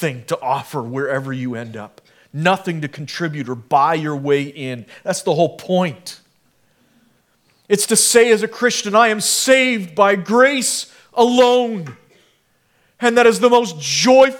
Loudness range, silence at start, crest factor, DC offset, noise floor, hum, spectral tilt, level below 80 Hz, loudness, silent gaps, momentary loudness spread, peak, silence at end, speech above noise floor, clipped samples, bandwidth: 8 LU; 0 s; 18 dB; under 0.1%; -61 dBFS; none; -3.5 dB/octave; -66 dBFS; -16 LUFS; none; 15 LU; 0 dBFS; 0 s; 45 dB; under 0.1%; 18 kHz